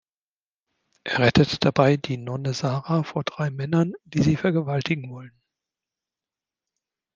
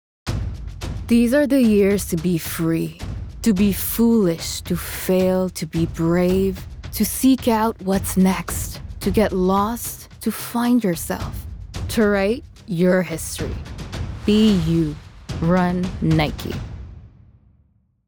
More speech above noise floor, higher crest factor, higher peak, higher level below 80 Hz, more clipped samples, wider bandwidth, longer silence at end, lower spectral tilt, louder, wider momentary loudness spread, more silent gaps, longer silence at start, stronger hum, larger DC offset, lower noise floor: first, over 67 dB vs 41 dB; first, 22 dB vs 16 dB; about the same, -2 dBFS vs -4 dBFS; second, -54 dBFS vs -36 dBFS; neither; second, 7.6 kHz vs over 20 kHz; first, 1.85 s vs 1 s; about the same, -6.5 dB/octave vs -6 dB/octave; second, -23 LUFS vs -20 LUFS; second, 10 LU vs 15 LU; neither; first, 1.05 s vs 0.25 s; neither; neither; first, under -90 dBFS vs -60 dBFS